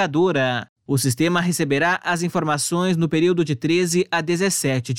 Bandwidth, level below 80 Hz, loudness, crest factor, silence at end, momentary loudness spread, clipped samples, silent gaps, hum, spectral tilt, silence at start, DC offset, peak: 17 kHz; -60 dBFS; -20 LUFS; 14 dB; 0 s; 3 LU; under 0.1%; 0.69-0.76 s; none; -4.5 dB/octave; 0 s; 0.1%; -8 dBFS